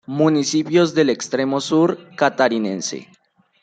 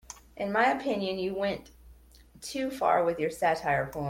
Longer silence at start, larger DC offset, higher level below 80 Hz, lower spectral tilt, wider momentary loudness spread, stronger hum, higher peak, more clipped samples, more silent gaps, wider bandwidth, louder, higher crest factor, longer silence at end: about the same, 0.1 s vs 0.1 s; neither; second, -66 dBFS vs -58 dBFS; about the same, -5 dB/octave vs -5 dB/octave; second, 7 LU vs 12 LU; neither; first, -2 dBFS vs -12 dBFS; neither; neither; second, 9.2 kHz vs 16.5 kHz; first, -19 LUFS vs -29 LUFS; about the same, 16 dB vs 18 dB; first, 0.6 s vs 0 s